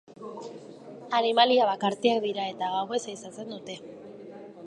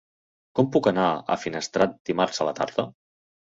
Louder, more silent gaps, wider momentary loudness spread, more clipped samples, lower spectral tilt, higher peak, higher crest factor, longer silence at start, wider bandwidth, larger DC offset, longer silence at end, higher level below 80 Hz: about the same, -25 LUFS vs -25 LUFS; second, none vs 2.00-2.05 s; first, 23 LU vs 8 LU; neither; about the same, -4 dB/octave vs -5 dB/octave; about the same, -6 dBFS vs -6 dBFS; about the same, 22 dB vs 20 dB; second, 0.1 s vs 0.55 s; first, 11 kHz vs 8 kHz; neither; second, 0 s vs 0.5 s; second, -80 dBFS vs -62 dBFS